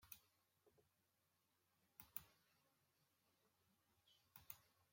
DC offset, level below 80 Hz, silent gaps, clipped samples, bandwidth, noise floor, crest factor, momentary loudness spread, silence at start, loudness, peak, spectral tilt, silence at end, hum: under 0.1%; under -90 dBFS; none; under 0.1%; 16.5 kHz; -86 dBFS; 38 dB; 12 LU; 0 s; -60 LUFS; -30 dBFS; -2 dB/octave; 0 s; none